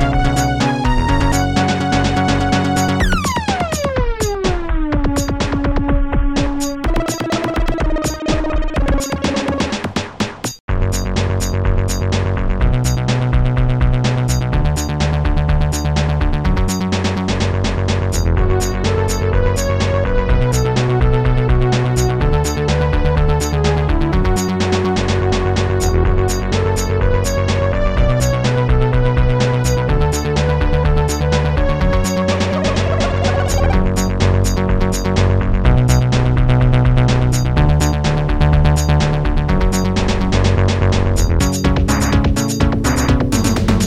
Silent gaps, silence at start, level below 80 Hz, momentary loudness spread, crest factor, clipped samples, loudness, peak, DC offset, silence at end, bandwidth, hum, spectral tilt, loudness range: 10.60-10.68 s; 0 s; -20 dBFS; 4 LU; 14 dB; under 0.1%; -16 LUFS; 0 dBFS; 0.5%; 0 s; 14 kHz; none; -6 dB/octave; 4 LU